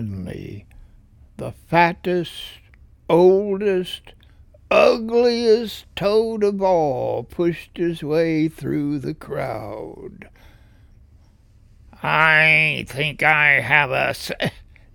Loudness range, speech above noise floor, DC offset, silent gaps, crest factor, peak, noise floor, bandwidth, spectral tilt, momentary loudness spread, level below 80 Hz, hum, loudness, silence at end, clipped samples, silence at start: 9 LU; 32 dB; under 0.1%; none; 20 dB; 0 dBFS; -51 dBFS; 18.5 kHz; -6 dB/octave; 19 LU; -48 dBFS; none; -18 LUFS; 0.3 s; under 0.1%; 0 s